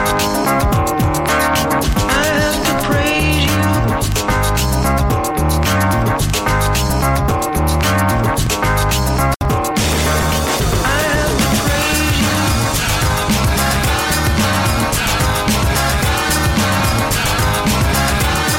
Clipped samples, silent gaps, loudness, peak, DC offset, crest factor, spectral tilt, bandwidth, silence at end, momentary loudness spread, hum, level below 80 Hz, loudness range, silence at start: under 0.1%; 9.36-9.40 s; -15 LUFS; -4 dBFS; under 0.1%; 10 dB; -4 dB/octave; 17 kHz; 0 s; 2 LU; none; -22 dBFS; 1 LU; 0 s